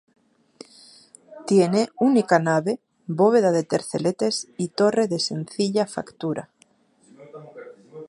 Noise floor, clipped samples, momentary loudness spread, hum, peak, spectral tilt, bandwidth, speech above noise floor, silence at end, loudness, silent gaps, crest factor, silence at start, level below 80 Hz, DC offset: -60 dBFS; under 0.1%; 20 LU; none; -2 dBFS; -5.5 dB/octave; 11.5 kHz; 39 dB; 0.05 s; -22 LUFS; none; 20 dB; 1.3 s; -72 dBFS; under 0.1%